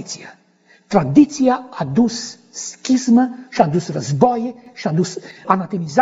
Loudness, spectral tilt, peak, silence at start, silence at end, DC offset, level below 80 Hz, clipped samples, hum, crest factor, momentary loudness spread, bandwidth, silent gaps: -18 LUFS; -6 dB/octave; 0 dBFS; 0 s; 0 s; under 0.1%; -56 dBFS; under 0.1%; none; 18 dB; 15 LU; 8 kHz; none